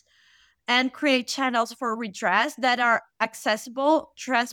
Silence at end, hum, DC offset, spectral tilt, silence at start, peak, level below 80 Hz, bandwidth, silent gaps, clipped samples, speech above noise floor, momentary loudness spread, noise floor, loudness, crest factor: 0 s; none; under 0.1%; -2.5 dB/octave; 0.7 s; -6 dBFS; -76 dBFS; 18.5 kHz; none; under 0.1%; 36 dB; 6 LU; -60 dBFS; -24 LUFS; 18 dB